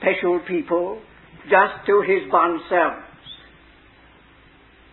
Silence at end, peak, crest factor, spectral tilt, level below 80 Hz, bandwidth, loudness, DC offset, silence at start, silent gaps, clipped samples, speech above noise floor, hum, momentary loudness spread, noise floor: 1.55 s; -4 dBFS; 18 dB; -10 dB/octave; -58 dBFS; 4.2 kHz; -20 LUFS; under 0.1%; 0 s; none; under 0.1%; 32 dB; none; 22 LU; -51 dBFS